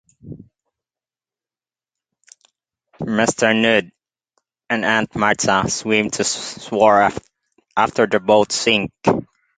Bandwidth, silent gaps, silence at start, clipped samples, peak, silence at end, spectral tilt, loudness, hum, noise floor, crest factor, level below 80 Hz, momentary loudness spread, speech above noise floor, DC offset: 9.6 kHz; none; 0.25 s; under 0.1%; 0 dBFS; 0.35 s; -3.5 dB/octave; -17 LUFS; none; under -90 dBFS; 20 dB; -54 dBFS; 10 LU; over 73 dB; under 0.1%